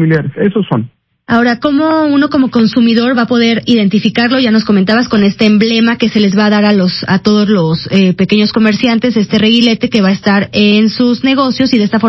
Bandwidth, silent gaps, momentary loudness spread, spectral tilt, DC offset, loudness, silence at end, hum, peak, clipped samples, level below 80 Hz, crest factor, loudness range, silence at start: 6.2 kHz; none; 3 LU; -6.5 dB/octave; under 0.1%; -10 LUFS; 0 s; none; 0 dBFS; 0.2%; -44 dBFS; 10 dB; 1 LU; 0 s